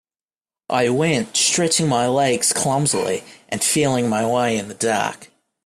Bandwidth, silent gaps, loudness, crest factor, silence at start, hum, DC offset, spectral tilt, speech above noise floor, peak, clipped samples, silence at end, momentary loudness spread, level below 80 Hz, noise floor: 15.5 kHz; none; -19 LUFS; 16 dB; 0.7 s; none; under 0.1%; -3.5 dB/octave; over 71 dB; -4 dBFS; under 0.1%; 0.4 s; 6 LU; -58 dBFS; under -90 dBFS